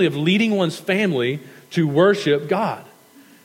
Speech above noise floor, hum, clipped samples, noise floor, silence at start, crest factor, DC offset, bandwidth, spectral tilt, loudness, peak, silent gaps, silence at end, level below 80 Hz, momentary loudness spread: 30 dB; none; under 0.1%; -49 dBFS; 0 s; 16 dB; under 0.1%; 16.5 kHz; -6 dB/octave; -19 LUFS; -4 dBFS; none; 0.6 s; -78 dBFS; 10 LU